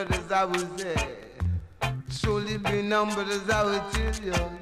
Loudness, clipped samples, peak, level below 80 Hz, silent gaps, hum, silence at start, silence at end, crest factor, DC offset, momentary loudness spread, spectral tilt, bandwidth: -28 LUFS; under 0.1%; -14 dBFS; -38 dBFS; none; none; 0 s; 0 s; 14 dB; under 0.1%; 6 LU; -5 dB/octave; 15.5 kHz